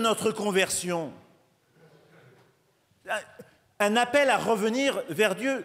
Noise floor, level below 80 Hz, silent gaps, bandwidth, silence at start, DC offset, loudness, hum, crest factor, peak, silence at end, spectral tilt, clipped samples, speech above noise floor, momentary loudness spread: -67 dBFS; -70 dBFS; none; 16 kHz; 0 s; under 0.1%; -26 LUFS; none; 20 dB; -8 dBFS; 0 s; -3 dB/octave; under 0.1%; 41 dB; 11 LU